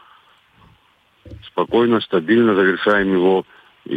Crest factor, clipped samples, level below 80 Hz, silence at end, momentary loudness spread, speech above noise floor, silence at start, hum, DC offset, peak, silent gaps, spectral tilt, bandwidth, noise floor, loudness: 14 dB; under 0.1%; -52 dBFS; 0 s; 6 LU; 41 dB; 1.25 s; none; under 0.1%; -4 dBFS; none; -8 dB/octave; 4.9 kHz; -57 dBFS; -17 LUFS